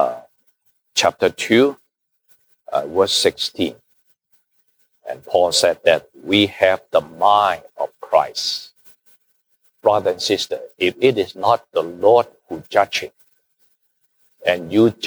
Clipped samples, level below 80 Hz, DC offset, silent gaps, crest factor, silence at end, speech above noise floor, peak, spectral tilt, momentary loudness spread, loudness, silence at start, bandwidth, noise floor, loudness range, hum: under 0.1%; -62 dBFS; under 0.1%; none; 18 dB; 0 s; 48 dB; -2 dBFS; -3.5 dB/octave; 11 LU; -18 LUFS; 0 s; over 20 kHz; -66 dBFS; 4 LU; none